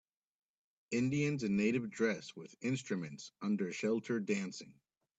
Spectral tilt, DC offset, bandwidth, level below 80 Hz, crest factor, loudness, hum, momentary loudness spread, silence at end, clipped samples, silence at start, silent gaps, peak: -6 dB/octave; under 0.1%; 8.4 kHz; -76 dBFS; 16 dB; -37 LUFS; none; 10 LU; 0.5 s; under 0.1%; 0.9 s; none; -20 dBFS